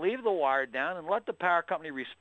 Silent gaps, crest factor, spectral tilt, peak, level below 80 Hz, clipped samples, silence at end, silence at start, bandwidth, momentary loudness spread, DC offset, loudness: none; 16 dB; -6 dB/octave; -14 dBFS; -78 dBFS; under 0.1%; 0.05 s; 0 s; 8.4 kHz; 7 LU; under 0.1%; -30 LUFS